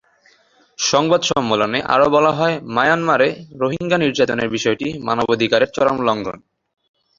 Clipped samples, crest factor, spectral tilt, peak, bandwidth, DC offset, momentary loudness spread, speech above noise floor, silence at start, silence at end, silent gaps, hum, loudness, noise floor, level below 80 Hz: under 0.1%; 16 dB; -4 dB/octave; -2 dBFS; 7.6 kHz; under 0.1%; 7 LU; 38 dB; 0.8 s; 0.8 s; none; none; -17 LUFS; -55 dBFS; -54 dBFS